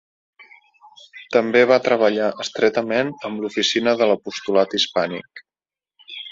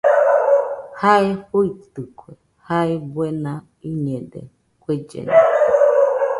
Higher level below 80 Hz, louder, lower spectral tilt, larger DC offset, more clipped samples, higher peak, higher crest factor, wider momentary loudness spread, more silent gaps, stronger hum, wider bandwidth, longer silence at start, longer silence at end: second, -66 dBFS vs -58 dBFS; about the same, -19 LUFS vs -18 LUFS; second, -3.5 dB/octave vs -7.5 dB/octave; neither; neither; about the same, -2 dBFS vs 0 dBFS; about the same, 20 dB vs 18 dB; second, 11 LU vs 20 LU; neither; neither; second, 7.8 kHz vs 11.5 kHz; first, 1.15 s vs 0.05 s; about the same, 0 s vs 0 s